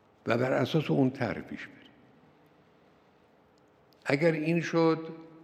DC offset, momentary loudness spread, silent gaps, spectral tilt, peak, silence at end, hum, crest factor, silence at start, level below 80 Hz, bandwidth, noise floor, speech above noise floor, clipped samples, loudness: under 0.1%; 16 LU; none; -7 dB/octave; -10 dBFS; 0.05 s; none; 22 dB; 0.25 s; -72 dBFS; 14 kHz; -63 dBFS; 34 dB; under 0.1%; -29 LUFS